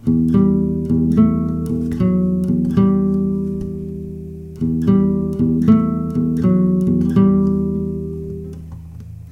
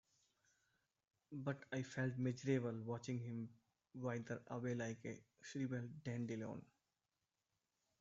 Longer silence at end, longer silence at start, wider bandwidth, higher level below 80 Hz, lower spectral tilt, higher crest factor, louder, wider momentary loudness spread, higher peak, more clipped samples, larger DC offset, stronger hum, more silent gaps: second, 0 s vs 1.35 s; second, 0.05 s vs 1.3 s; second, 3.6 kHz vs 7.6 kHz; first, -36 dBFS vs -82 dBFS; first, -10.5 dB/octave vs -7 dB/octave; about the same, 16 dB vs 20 dB; first, -17 LUFS vs -46 LUFS; first, 16 LU vs 12 LU; first, 0 dBFS vs -26 dBFS; neither; neither; neither; neither